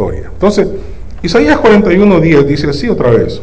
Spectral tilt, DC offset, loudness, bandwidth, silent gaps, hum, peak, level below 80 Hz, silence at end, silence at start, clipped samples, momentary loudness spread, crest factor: -7 dB/octave; 6%; -9 LUFS; 8 kHz; none; none; 0 dBFS; -26 dBFS; 0 s; 0 s; under 0.1%; 12 LU; 10 dB